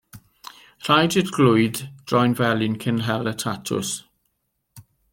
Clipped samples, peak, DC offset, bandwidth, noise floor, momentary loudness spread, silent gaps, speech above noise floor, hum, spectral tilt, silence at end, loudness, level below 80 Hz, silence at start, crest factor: under 0.1%; -2 dBFS; under 0.1%; 17 kHz; -74 dBFS; 17 LU; none; 53 dB; none; -5 dB/octave; 0.3 s; -21 LUFS; -60 dBFS; 0.15 s; 20 dB